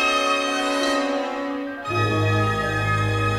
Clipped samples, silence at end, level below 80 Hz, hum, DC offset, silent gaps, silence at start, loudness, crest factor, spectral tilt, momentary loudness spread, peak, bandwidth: under 0.1%; 0 s; -44 dBFS; none; under 0.1%; none; 0 s; -22 LUFS; 12 dB; -5 dB/octave; 7 LU; -8 dBFS; 13.5 kHz